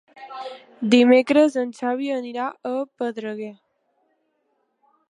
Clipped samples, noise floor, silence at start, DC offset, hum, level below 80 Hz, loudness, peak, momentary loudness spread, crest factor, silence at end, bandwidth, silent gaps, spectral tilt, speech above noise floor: under 0.1%; -70 dBFS; 0.15 s; under 0.1%; none; -76 dBFS; -21 LUFS; -4 dBFS; 21 LU; 20 dB; 1.55 s; 10.5 kHz; none; -5 dB/octave; 50 dB